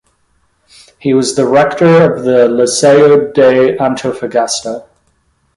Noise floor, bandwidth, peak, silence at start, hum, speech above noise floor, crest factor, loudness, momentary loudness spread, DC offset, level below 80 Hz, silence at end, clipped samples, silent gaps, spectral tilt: -57 dBFS; 11.5 kHz; 0 dBFS; 1.05 s; none; 48 dB; 10 dB; -10 LUFS; 10 LU; under 0.1%; -52 dBFS; 0.75 s; under 0.1%; none; -5 dB/octave